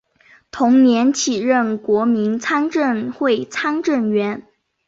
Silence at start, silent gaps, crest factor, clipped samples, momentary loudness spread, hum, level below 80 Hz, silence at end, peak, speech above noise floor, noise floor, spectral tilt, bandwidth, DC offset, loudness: 0.55 s; none; 14 dB; under 0.1%; 8 LU; none; -62 dBFS; 0.45 s; -4 dBFS; 35 dB; -52 dBFS; -4.5 dB/octave; 7.8 kHz; under 0.1%; -17 LUFS